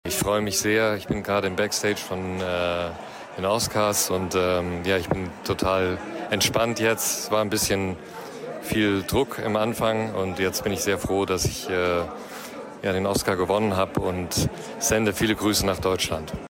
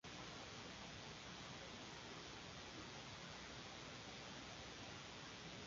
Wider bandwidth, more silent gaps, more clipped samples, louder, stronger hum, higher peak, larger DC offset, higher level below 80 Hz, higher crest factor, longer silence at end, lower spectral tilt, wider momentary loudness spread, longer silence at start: first, 16.5 kHz vs 7.4 kHz; neither; neither; first, -24 LUFS vs -53 LUFS; neither; first, -6 dBFS vs -38 dBFS; neither; first, -46 dBFS vs -70 dBFS; about the same, 18 dB vs 16 dB; about the same, 0 s vs 0 s; about the same, -3.5 dB/octave vs -2.5 dB/octave; first, 8 LU vs 0 LU; about the same, 0.05 s vs 0.05 s